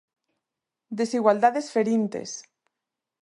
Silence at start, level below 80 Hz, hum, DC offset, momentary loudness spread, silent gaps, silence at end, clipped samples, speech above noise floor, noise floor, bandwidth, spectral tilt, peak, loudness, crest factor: 0.9 s; -78 dBFS; none; under 0.1%; 17 LU; none; 0.8 s; under 0.1%; 63 dB; -86 dBFS; 11.5 kHz; -5 dB/octave; -6 dBFS; -24 LUFS; 20 dB